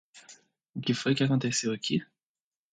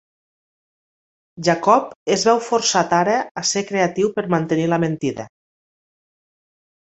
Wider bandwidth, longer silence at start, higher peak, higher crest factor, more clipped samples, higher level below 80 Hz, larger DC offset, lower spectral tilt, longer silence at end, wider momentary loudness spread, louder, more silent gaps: first, 9.4 kHz vs 8.2 kHz; second, 0.15 s vs 1.35 s; second, -14 dBFS vs -2 dBFS; about the same, 18 dB vs 20 dB; neither; second, -72 dBFS vs -62 dBFS; neither; about the same, -4.5 dB/octave vs -4 dB/octave; second, 0.7 s vs 1.55 s; about the same, 8 LU vs 6 LU; second, -29 LUFS vs -19 LUFS; second, none vs 1.96-2.06 s, 3.31-3.35 s